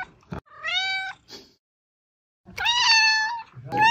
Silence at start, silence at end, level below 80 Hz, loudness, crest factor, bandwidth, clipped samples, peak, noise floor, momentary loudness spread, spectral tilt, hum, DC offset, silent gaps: 0 s; 0 s; -58 dBFS; -21 LUFS; 20 dB; 16 kHz; under 0.1%; -6 dBFS; -45 dBFS; 24 LU; -0.5 dB/octave; none; under 0.1%; 1.59-2.44 s